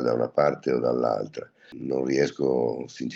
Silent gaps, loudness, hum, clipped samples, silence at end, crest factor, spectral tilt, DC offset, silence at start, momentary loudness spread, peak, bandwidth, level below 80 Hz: none; -25 LUFS; none; under 0.1%; 0 s; 18 dB; -6.5 dB/octave; under 0.1%; 0 s; 13 LU; -8 dBFS; 7.8 kHz; -66 dBFS